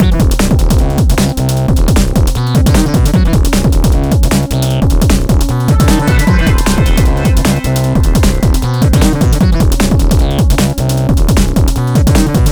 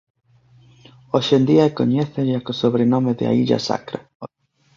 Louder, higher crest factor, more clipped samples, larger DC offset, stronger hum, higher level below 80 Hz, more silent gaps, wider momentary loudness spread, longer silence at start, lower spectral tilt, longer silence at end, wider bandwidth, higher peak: first, -11 LUFS vs -19 LUFS; second, 8 dB vs 16 dB; neither; neither; neither; first, -12 dBFS vs -58 dBFS; second, none vs 4.15-4.20 s; second, 3 LU vs 18 LU; second, 0 s vs 1.15 s; about the same, -6 dB/octave vs -7 dB/octave; second, 0 s vs 0.5 s; first, over 20 kHz vs 7.4 kHz; about the same, 0 dBFS vs -2 dBFS